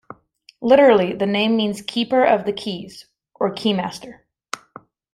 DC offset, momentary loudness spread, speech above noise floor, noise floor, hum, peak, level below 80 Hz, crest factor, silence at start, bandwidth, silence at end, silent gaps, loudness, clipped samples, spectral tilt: under 0.1%; 20 LU; 35 dB; -53 dBFS; none; -2 dBFS; -60 dBFS; 18 dB; 0.6 s; 13 kHz; 1 s; none; -18 LUFS; under 0.1%; -5.5 dB/octave